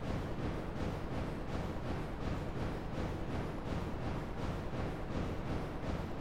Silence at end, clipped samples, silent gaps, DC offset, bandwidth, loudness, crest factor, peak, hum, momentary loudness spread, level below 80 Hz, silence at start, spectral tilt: 0 s; under 0.1%; none; under 0.1%; 16 kHz; -40 LUFS; 14 dB; -24 dBFS; none; 1 LU; -46 dBFS; 0 s; -7 dB/octave